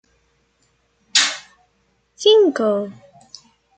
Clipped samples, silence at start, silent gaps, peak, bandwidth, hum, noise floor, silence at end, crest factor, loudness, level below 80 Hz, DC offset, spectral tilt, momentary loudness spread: under 0.1%; 1.15 s; none; -2 dBFS; 9.4 kHz; none; -64 dBFS; 0.85 s; 20 dB; -16 LUFS; -70 dBFS; under 0.1%; -1.5 dB/octave; 15 LU